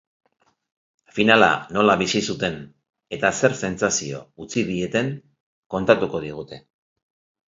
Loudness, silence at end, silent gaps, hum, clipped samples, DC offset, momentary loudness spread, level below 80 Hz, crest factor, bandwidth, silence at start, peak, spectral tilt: -21 LUFS; 0.9 s; 5.40-5.70 s; none; under 0.1%; under 0.1%; 19 LU; -54 dBFS; 22 dB; 7.8 kHz; 1.15 s; 0 dBFS; -4 dB/octave